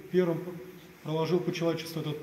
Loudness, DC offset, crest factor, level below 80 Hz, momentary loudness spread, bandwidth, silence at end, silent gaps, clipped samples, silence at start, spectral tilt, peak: -31 LUFS; under 0.1%; 18 dB; -70 dBFS; 16 LU; 16 kHz; 0 s; none; under 0.1%; 0 s; -6.5 dB/octave; -14 dBFS